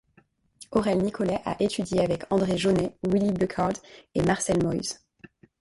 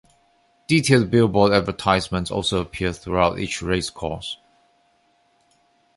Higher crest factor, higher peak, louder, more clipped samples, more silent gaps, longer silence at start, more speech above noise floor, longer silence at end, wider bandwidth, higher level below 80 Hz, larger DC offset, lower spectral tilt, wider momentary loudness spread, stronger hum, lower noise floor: about the same, 18 dB vs 20 dB; second, -8 dBFS vs -2 dBFS; second, -26 LUFS vs -21 LUFS; neither; neither; about the same, 0.6 s vs 0.7 s; second, 38 dB vs 42 dB; second, 0.65 s vs 1.6 s; about the same, 11.5 kHz vs 11.5 kHz; second, -52 dBFS vs -42 dBFS; neither; about the same, -5.5 dB/octave vs -5 dB/octave; second, 6 LU vs 13 LU; neither; about the same, -63 dBFS vs -62 dBFS